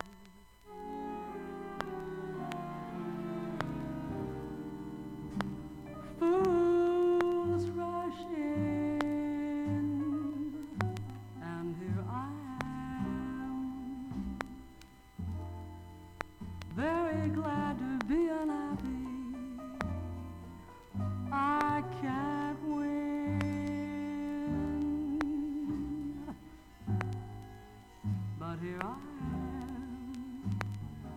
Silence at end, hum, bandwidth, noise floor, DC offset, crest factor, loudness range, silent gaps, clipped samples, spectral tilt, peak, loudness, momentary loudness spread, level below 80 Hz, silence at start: 0 s; none; 15.5 kHz; -57 dBFS; under 0.1%; 22 dB; 9 LU; none; under 0.1%; -8 dB/octave; -14 dBFS; -36 LUFS; 14 LU; -54 dBFS; 0 s